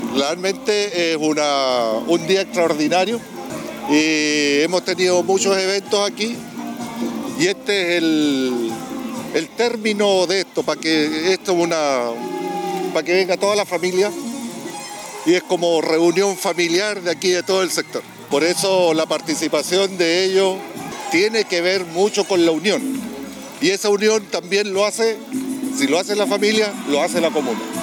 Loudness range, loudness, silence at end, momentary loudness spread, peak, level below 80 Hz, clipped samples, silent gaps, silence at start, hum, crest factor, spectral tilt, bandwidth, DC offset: 2 LU; -19 LUFS; 0 s; 11 LU; -6 dBFS; -64 dBFS; under 0.1%; none; 0 s; none; 14 dB; -3 dB/octave; 19.5 kHz; under 0.1%